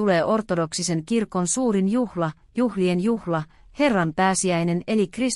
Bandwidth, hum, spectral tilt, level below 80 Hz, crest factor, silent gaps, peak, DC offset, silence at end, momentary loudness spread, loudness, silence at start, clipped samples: 12 kHz; none; -5 dB/octave; -54 dBFS; 14 dB; none; -8 dBFS; under 0.1%; 0 s; 6 LU; -23 LUFS; 0 s; under 0.1%